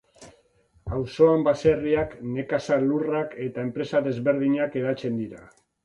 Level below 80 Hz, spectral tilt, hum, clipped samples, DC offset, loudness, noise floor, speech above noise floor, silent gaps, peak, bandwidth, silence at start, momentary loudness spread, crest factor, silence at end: -50 dBFS; -7.5 dB/octave; none; under 0.1%; under 0.1%; -24 LUFS; -62 dBFS; 38 dB; none; -6 dBFS; 10 kHz; 0.2 s; 11 LU; 20 dB; 0.4 s